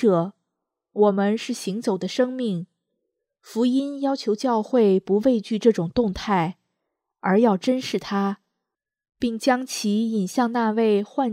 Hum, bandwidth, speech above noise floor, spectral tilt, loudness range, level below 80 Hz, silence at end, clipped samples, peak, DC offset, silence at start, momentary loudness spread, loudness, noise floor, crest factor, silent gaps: none; 15 kHz; 62 dB; -6 dB/octave; 4 LU; -56 dBFS; 0 s; under 0.1%; -4 dBFS; under 0.1%; 0 s; 9 LU; -23 LUFS; -84 dBFS; 18 dB; none